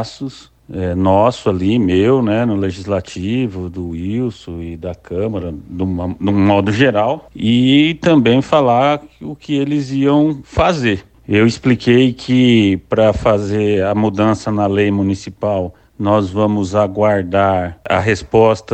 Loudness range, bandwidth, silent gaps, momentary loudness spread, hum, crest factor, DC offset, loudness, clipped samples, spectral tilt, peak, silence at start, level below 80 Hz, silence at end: 6 LU; 8.6 kHz; none; 12 LU; none; 14 dB; under 0.1%; -15 LUFS; under 0.1%; -7 dB/octave; 0 dBFS; 0 s; -40 dBFS; 0 s